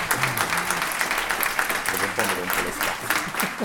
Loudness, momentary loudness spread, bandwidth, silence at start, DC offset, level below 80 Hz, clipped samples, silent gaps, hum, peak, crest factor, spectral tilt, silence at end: -23 LUFS; 2 LU; 19 kHz; 0 s; under 0.1%; -50 dBFS; under 0.1%; none; none; 0 dBFS; 24 dB; -2 dB/octave; 0 s